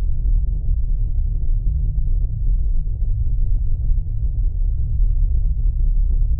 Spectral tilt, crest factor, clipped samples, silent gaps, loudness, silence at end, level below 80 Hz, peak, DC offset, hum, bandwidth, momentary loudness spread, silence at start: -16.5 dB/octave; 10 dB; under 0.1%; none; -24 LUFS; 0 s; -18 dBFS; -8 dBFS; under 0.1%; none; 0.7 kHz; 2 LU; 0 s